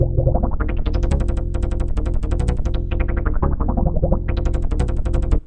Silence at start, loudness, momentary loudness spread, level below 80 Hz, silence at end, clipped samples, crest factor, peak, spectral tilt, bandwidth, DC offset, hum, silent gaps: 0 s; -22 LUFS; 4 LU; -20 dBFS; 0.05 s; under 0.1%; 18 dB; 0 dBFS; -8.5 dB/octave; 9 kHz; under 0.1%; none; none